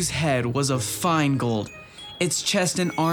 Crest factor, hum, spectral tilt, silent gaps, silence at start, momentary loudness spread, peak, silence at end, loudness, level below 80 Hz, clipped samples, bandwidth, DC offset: 14 dB; none; -4 dB/octave; none; 0 s; 10 LU; -10 dBFS; 0 s; -23 LUFS; -52 dBFS; under 0.1%; 19.5 kHz; under 0.1%